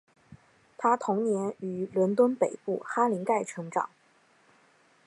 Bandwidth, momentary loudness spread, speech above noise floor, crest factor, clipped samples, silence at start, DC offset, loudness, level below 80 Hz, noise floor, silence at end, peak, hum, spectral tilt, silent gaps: 11.5 kHz; 9 LU; 36 dB; 18 dB; under 0.1%; 0.8 s; under 0.1%; -28 LUFS; -76 dBFS; -64 dBFS; 1.2 s; -10 dBFS; none; -7 dB/octave; none